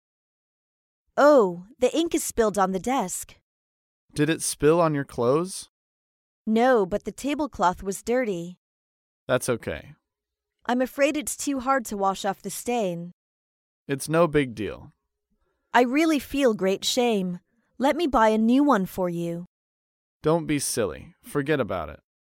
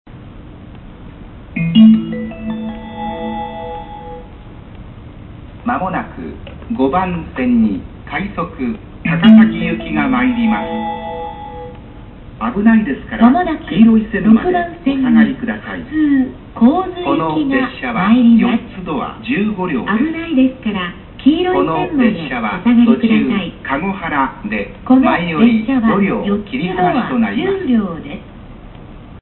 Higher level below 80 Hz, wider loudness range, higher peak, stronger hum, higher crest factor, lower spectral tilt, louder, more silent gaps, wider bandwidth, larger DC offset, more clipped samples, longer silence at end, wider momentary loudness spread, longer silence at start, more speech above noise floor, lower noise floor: second, -54 dBFS vs -38 dBFS; about the same, 5 LU vs 7 LU; second, -6 dBFS vs 0 dBFS; neither; first, 20 dB vs 14 dB; second, -4.5 dB/octave vs -10.5 dB/octave; second, -24 LUFS vs -15 LUFS; first, 3.42-4.08 s, 5.69-6.45 s, 8.57-9.27 s, 13.13-13.86 s, 19.47-20.20 s vs none; first, 17 kHz vs 4.2 kHz; neither; neither; first, 0.4 s vs 0 s; second, 14 LU vs 17 LU; first, 1.15 s vs 0.05 s; first, 62 dB vs 20 dB; first, -86 dBFS vs -34 dBFS